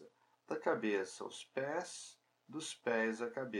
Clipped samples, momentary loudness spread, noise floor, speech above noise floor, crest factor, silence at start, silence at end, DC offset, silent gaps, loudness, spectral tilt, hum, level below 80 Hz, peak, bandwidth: under 0.1%; 12 LU; -64 dBFS; 25 dB; 20 dB; 0 s; 0 s; under 0.1%; none; -40 LUFS; -3.5 dB/octave; none; under -90 dBFS; -20 dBFS; 12 kHz